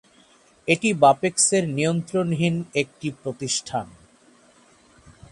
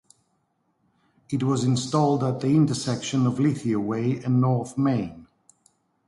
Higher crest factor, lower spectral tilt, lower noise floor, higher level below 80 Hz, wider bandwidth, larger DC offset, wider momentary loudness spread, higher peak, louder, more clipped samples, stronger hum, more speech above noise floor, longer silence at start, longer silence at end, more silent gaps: about the same, 20 dB vs 16 dB; second, -4 dB/octave vs -6.5 dB/octave; second, -56 dBFS vs -71 dBFS; about the same, -60 dBFS vs -60 dBFS; about the same, 11.5 kHz vs 11.5 kHz; neither; first, 13 LU vs 6 LU; first, -4 dBFS vs -8 dBFS; about the same, -22 LUFS vs -24 LUFS; neither; neither; second, 34 dB vs 48 dB; second, 0.65 s vs 1.3 s; second, 0.2 s vs 0.85 s; neither